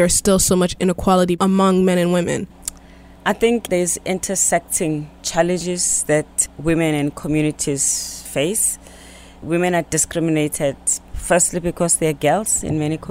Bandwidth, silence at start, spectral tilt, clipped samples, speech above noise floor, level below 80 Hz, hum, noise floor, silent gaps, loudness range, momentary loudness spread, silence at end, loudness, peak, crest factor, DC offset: 16 kHz; 0 s; -4 dB/octave; under 0.1%; 25 dB; -40 dBFS; none; -43 dBFS; none; 2 LU; 8 LU; 0 s; -18 LUFS; -2 dBFS; 16 dB; under 0.1%